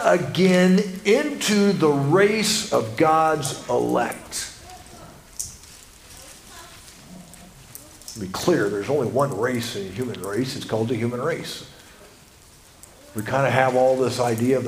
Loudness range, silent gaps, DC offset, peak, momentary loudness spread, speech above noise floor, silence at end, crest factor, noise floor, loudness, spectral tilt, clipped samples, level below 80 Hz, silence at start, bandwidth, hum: 17 LU; none; under 0.1%; -2 dBFS; 24 LU; 29 dB; 0 s; 22 dB; -49 dBFS; -21 LUFS; -5 dB/octave; under 0.1%; -54 dBFS; 0 s; 16 kHz; none